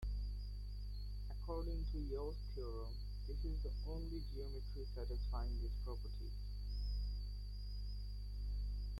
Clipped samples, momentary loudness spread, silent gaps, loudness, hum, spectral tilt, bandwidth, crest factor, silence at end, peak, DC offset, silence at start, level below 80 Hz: under 0.1%; 5 LU; none; -47 LUFS; 50 Hz at -45 dBFS; -7.5 dB/octave; 12 kHz; 10 dB; 0 s; -32 dBFS; under 0.1%; 0 s; -44 dBFS